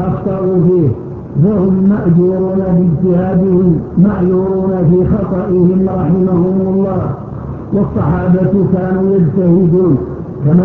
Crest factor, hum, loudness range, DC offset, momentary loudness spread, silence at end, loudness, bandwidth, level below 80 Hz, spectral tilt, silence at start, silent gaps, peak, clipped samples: 12 dB; none; 2 LU; under 0.1%; 6 LU; 0 s; -12 LUFS; 2.9 kHz; -32 dBFS; -13 dB/octave; 0 s; none; 0 dBFS; under 0.1%